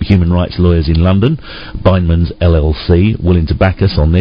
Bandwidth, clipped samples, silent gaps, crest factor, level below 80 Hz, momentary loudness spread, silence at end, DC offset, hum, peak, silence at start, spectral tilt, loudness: 5.4 kHz; 0.6%; none; 10 dB; -16 dBFS; 3 LU; 0 s; under 0.1%; none; 0 dBFS; 0 s; -10.5 dB/octave; -12 LUFS